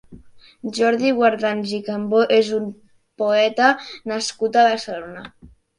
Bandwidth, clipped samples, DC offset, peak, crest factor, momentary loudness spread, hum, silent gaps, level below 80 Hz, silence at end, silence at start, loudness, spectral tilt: 11 kHz; under 0.1%; under 0.1%; -2 dBFS; 18 dB; 15 LU; none; none; -60 dBFS; 0.3 s; 0.1 s; -19 LUFS; -4 dB/octave